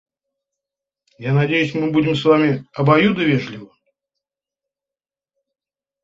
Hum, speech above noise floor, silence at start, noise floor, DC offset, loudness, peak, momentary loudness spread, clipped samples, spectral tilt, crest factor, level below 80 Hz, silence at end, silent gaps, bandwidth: 50 Hz at -50 dBFS; over 73 dB; 1.2 s; under -90 dBFS; under 0.1%; -17 LUFS; -2 dBFS; 11 LU; under 0.1%; -7.5 dB/octave; 18 dB; -58 dBFS; 2.4 s; none; 7.6 kHz